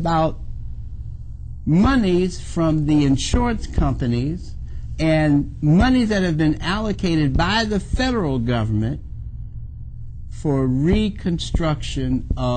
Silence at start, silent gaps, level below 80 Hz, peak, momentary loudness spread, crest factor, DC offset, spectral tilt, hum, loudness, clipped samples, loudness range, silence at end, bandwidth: 0 s; none; -28 dBFS; -6 dBFS; 18 LU; 14 dB; under 0.1%; -6.5 dB/octave; none; -20 LUFS; under 0.1%; 4 LU; 0 s; 9.2 kHz